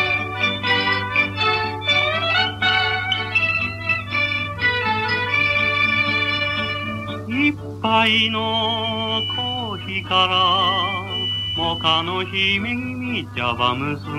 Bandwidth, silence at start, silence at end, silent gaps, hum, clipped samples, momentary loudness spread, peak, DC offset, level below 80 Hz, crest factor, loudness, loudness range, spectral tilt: 13.5 kHz; 0 s; 0 s; none; none; under 0.1%; 8 LU; -2 dBFS; under 0.1%; -48 dBFS; 18 dB; -19 LUFS; 2 LU; -5 dB/octave